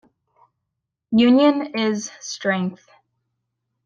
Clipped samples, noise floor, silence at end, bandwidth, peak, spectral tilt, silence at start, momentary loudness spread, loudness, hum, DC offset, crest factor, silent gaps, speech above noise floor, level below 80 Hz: under 0.1%; -80 dBFS; 1.1 s; 7.4 kHz; -4 dBFS; -5 dB/octave; 1.1 s; 14 LU; -20 LUFS; none; under 0.1%; 18 dB; none; 62 dB; -66 dBFS